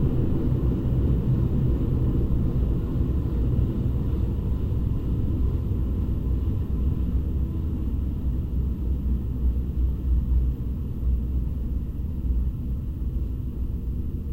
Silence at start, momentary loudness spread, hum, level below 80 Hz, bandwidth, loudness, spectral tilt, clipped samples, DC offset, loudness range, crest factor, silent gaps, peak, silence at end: 0 s; 6 LU; none; -26 dBFS; 3.7 kHz; -27 LUFS; -10.5 dB/octave; under 0.1%; 0.3%; 4 LU; 14 dB; none; -10 dBFS; 0 s